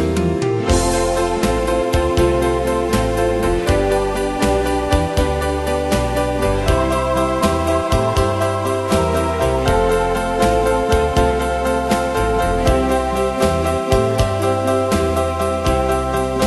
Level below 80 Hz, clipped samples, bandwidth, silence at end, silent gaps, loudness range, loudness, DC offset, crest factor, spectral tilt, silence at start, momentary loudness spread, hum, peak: -26 dBFS; under 0.1%; 12.5 kHz; 0 s; none; 1 LU; -17 LUFS; under 0.1%; 16 dB; -5.5 dB/octave; 0 s; 3 LU; none; 0 dBFS